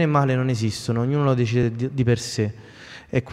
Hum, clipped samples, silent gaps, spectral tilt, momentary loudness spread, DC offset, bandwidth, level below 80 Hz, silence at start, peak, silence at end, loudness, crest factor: none; under 0.1%; none; -6.5 dB/octave; 9 LU; under 0.1%; 12.5 kHz; -50 dBFS; 0 s; -6 dBFS; 0 s; -22 LUFS; 16 dB